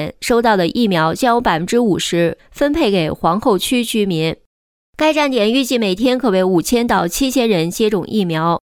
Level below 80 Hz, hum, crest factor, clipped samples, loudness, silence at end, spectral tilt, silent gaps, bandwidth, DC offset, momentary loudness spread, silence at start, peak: -42 dBFS; none; 12 dB; under 0.1%; -16 LUFS; 0.1 s; -5 dB/octave; 4.46-4.93 s; 19.5 kHz; under 0.1%; 4 LU; 0 s; -2 dBFS